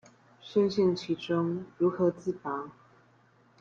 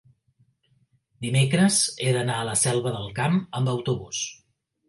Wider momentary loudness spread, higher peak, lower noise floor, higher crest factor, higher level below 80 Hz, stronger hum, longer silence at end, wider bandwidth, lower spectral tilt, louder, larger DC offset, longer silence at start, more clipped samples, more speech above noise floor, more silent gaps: about the same, 10 LU vs 11 LU; second, -14 dBFS vs -8 dBFS; about the same, -63 dBFS vs -66 dBFS; about the same, 16 dB vs 18 dB; second, -70 dBFS vs -60 dBFS; neither; first, 0.9 s vs 0.55 s; second, 7.4 kHz vs 11.5 kHz; first, -7.5 dB/octave vs -4.5 dB/octave; second, -30 LUFS vs -24 LUFS; neither; second, 0.45 s vs 1.2 s; neither; second, 34 dB vs 42 dB; neither